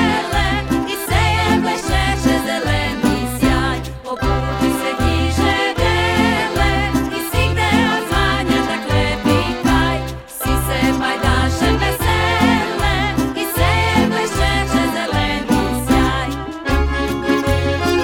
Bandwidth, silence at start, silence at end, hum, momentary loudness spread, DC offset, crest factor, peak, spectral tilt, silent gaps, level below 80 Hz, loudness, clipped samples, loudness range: 18.5 kHz; 0 s; 0 s; none; 5 LU; under 0.1%; 16 dB; -2 dBFS; -5 dB/octave; none; -26 dBFS; -17 LUFS; under 0.1%; 2 LU